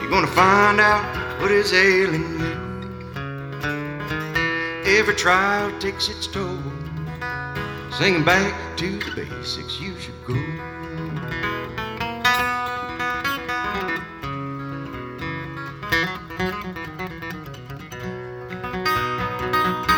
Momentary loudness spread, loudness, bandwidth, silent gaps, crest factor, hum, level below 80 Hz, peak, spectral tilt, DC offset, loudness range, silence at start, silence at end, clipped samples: 16 LU; -22 LUFS; 18 kHz; none; 22 dB; none; -46 dBFS; 0 dBFS; -4.5 dB/octave; under 0.1%; 7 LU; 0 s; 0 s; under 0.1%